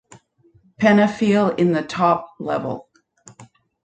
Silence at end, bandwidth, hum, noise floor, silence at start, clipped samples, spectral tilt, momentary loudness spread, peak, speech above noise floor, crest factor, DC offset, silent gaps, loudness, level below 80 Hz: 0.4 s; 8.8 kHz; none; -57 dBFS; 0.8 s; under 0.1%; -7 dB/octave; 11 LU; -2 dBFS; 39 dB; 18 dB; under 0.1%; none; -19 LUFS; -60 dBFS